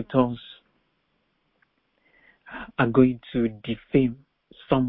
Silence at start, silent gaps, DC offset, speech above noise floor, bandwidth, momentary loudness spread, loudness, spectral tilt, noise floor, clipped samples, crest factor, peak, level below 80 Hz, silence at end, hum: 0 s; none; under 0.1%; 49 dB; 4.1 kHz; 21 LU; -24 LUFS; -11.5 dB/octave; -72 dBFS; under 0.1%; 22 dB; -4 dBFS; -52 dBFS; 0 s; none